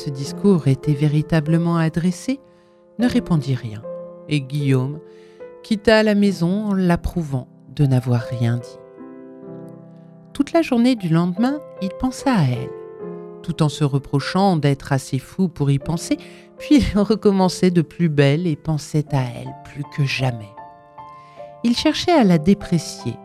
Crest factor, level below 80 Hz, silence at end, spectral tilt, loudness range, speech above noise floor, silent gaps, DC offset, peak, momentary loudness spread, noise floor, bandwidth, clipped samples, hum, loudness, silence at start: 18 dB; -42 dBFS; 0 s; -7 dB/octave; 5 LU; 24 dB; none; under 0.1%; 0 dBFS; 19 LU; -43 dBFS; 13.5 kHz; under 0.1%; none; -19 LUFS; 0 s